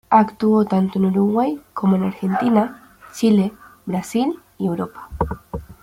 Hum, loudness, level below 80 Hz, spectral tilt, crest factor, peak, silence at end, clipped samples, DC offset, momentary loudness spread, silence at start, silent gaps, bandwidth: none; -20 LUFS; -44 dBFS; -7.5 dB/octave; 18 dB; -2 dBFS; 0.1 s; under 0.1%; under 0.1%; 10 LU; 0.1 s; none; 15.5 kHz